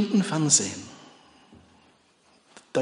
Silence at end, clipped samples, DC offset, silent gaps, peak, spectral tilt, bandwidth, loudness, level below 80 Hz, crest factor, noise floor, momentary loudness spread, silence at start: 0 s; under 0.1%; under 0.1%; none; -6 dBFS; -3.5 dB/octave; 10.5 kHz; -23 LUFS; -70 dBFS; 22 dB; -62 dBFS; 20 LU; 0 s